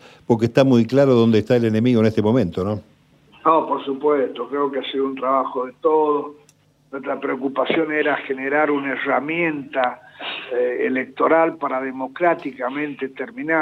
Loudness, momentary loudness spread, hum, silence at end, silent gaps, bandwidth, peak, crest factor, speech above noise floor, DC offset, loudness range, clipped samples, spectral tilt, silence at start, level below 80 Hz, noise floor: -20 LUFS; 11 LU; 50 Hz at -60 dBFS; 0 s; none; 9.2 kHz; -2 dBFS; 18 dB; 37 dB; under 0.1%; 4 LU; under 0.1%; -7.5 dB/octave; 0.3 s; -64 dBFS; -56 dBFS